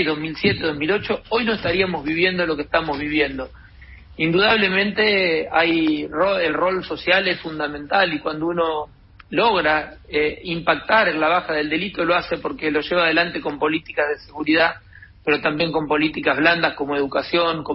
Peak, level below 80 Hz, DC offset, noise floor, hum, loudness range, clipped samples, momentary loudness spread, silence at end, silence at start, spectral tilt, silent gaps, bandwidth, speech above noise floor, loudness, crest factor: -2 dBFS; -48 dBFS; under 0.1%; -43 dBFS; none; 3 LU; under 0.1%; 7 LU; 0 s; 0 s; -9 dB/octave; none; 5.8 kHz; 23 dB; -20 LUFS; 18 dB